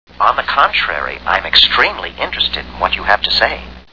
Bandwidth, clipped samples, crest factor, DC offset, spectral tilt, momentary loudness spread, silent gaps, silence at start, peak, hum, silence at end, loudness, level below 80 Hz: 5.4 kHz; 0.2%; 16 dB; 0.8%; -3 dB/octave; 10 LU; none; 0.1 s; 0 dBFS; none; 0 s; -13 LUFS; -36 dBFS